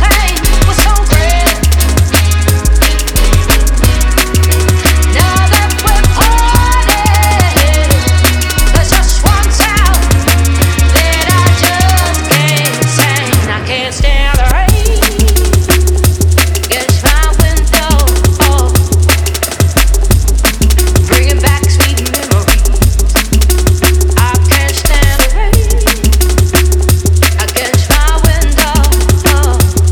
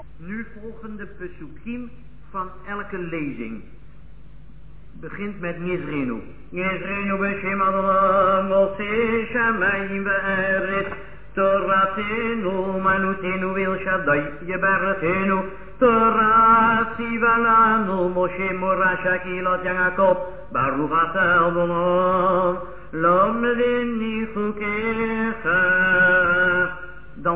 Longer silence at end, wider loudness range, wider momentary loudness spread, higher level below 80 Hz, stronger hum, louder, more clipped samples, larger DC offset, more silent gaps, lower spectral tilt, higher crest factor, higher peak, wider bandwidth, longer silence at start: about the same, 0 s vs 0 s; second, 1 LU vs 15 LU; second, 2 LU vs 17 LU; first, -10 dBFS vs -46 dBFS; neither; first, -9 LUFS vs -20 LUFS; first, 0.3% vs under 0.1%; second, under 0.1% vs 1%; neither; second, -4 dB/octave vs -9.5 dB/octave; second, 8 dB vs 16 dB; first, 0 dBFS vs -4 dBFS; first, over 20 kHz vs 4 kHz; about the same, 0 s vs 0 s